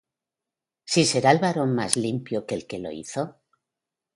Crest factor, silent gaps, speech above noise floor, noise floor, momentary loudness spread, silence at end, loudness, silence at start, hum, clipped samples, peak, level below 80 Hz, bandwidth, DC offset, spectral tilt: 24 dB; none; 65 dB; -88 dBFS; 13 LU; 0.85 s; -24 LUFS; 0.85 s; none; under 0.1%; -2 dBFS; -64 dBFS; 11.5 kHz; under 0.1%; -4 dB/octave